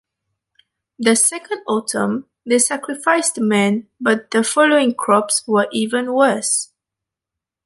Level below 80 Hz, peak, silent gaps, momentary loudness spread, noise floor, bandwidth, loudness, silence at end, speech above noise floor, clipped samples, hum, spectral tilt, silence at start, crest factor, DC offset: -68 dBFS; -2 dBFS; none; 7 LU; -85 dBFS; 12 kHz; -17 LUFS; 1 s; 68 dB; under 0.1%; none; -3 dB/octave; 1 s; 16 dB; under 0.1%